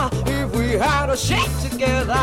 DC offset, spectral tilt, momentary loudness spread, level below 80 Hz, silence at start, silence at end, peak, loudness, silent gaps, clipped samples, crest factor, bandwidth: under 0.1%; -4.5 dB/octave; 3 LU; -28 dBFS; 0 s; 0 s; -6 dBFS; -20 LUFS; none; under 0.1%; 12 dB; 17 kHz